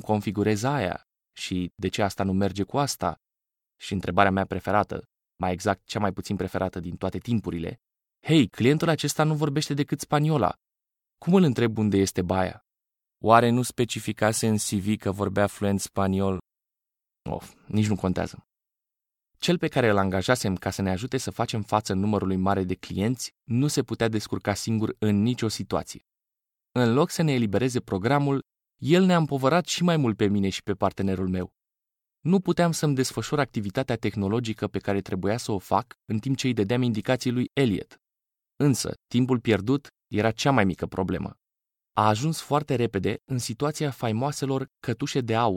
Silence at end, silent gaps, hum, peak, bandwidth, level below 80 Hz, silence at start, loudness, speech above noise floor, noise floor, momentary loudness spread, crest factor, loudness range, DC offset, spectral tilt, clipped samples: 0 s; none; none; -2 dBFS; 16.5 kHz; -56 dBFS; 0.05 s; -26 LUFS; 64 dB; -88 dBFS; 9 LU; 24 dB; 4 LU; under 0.1%; -5.5 dB/octave; under 0.1%